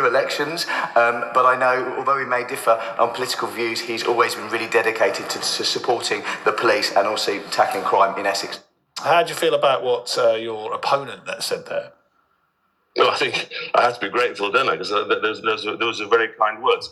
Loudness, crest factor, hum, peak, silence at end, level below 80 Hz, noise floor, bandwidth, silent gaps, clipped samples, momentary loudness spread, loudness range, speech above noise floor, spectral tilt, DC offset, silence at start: -20 LUFS; 20 dB; none; -2 dBFS; 0 s; -74 dBFS; -67 dBFS; 14.5 kHz; none; under 0.1%; 7 LU; 3 LU; 47 dB; -2.5 dB/octave; under 0.1%; 0 s